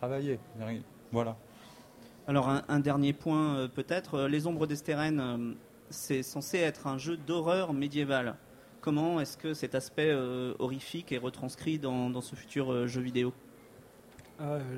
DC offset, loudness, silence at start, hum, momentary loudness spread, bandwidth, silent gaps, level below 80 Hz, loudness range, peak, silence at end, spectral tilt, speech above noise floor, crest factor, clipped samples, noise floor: under 0.1%; -33 LUFS; 0 s; none; 11 LU; 16 kHz; none; -66 dBFS; 3 LU; -14 dBFS; 0 s; -6 dB/octave; 23 dB; 20 dB; under 0.1%; -56 dBFS